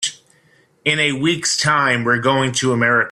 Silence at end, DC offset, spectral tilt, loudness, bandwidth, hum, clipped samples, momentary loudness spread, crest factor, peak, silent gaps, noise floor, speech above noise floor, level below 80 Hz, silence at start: 0 s; under 0.1%; -3.5 dB/octave; -16 LUFS; 13.5 kHz; none; under 0.1%; 4 LU; 16 dB; -2 dBFS; none; -56 dBFS; 39 dB; -56 dBFS; 0 s